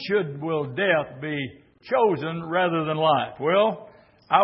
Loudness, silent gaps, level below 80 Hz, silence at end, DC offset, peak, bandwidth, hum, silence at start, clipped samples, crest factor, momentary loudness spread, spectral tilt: -24 LUFS; none; -66 dBFS; 0 s; under 0.1%; -4 dBFS; 5.8 kHz; none; 0 s; under 0.1%; 20 dB; 9 LU; -10 dB/octave